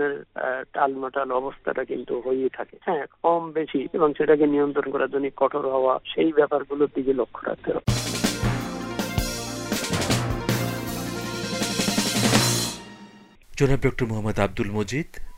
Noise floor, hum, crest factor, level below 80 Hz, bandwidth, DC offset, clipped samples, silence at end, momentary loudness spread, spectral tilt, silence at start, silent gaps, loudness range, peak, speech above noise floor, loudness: -48 dBFS; none; 20 dB; -42 dBFS; 16 kHz; under 0.1%; under 0.1%; 0 s; 9 LU; -4.5 dB/octave; 0 s; none; 4 LU; -6 dBFS; 24 dB; -24 LUFS